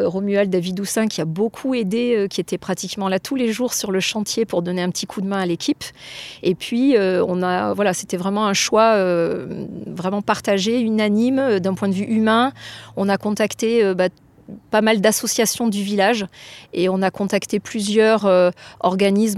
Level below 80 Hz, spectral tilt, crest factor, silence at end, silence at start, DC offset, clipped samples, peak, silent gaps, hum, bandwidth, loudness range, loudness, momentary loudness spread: -60 dBFS; -4.5 dB/octave; 16 dB; 0 s; 0 s; under 0.1%; under 0.1%; -2 dBFS; none; none; 15.5 kHz; 3 LU; -19 LUFS; 9 LU